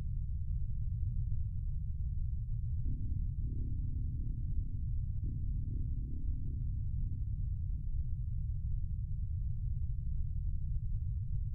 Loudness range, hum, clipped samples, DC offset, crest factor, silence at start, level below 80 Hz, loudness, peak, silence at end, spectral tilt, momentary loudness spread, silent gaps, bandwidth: 0 LU; none; under 0.1%; under 0.1%; 12 dB; 0 s; -38 dBFS; -40 LUFS; -22 dBFS; 0 s; -13 dB/octave; 1 LU; none; 0.5 kHz